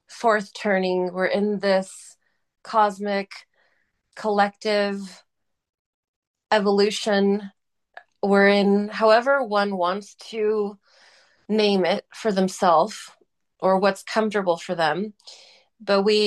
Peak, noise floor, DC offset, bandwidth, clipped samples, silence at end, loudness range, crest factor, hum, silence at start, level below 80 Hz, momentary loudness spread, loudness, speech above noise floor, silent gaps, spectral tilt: -4 dBFS; -68 dBFS; under 0.1%; 12.5 kHz; under 0.1%; 0 s; 5 LU; 18 dB; none; 0.1 s; -72 dBFS; 13 LU; -22 LUFS; 47 dB; 5.79-6.34 s; -5 dB/octave